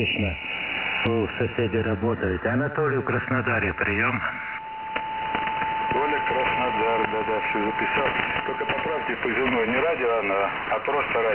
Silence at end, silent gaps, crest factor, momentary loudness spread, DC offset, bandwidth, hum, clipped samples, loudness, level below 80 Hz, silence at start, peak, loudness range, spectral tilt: 0 s; none; 18 dB; 4 LU; 0.1%; 4 kHz; none; under 0.1%; -24 LUFS; -46 dBFS; 0 s; -6 dBFS; 1 LU; -9 dB/octave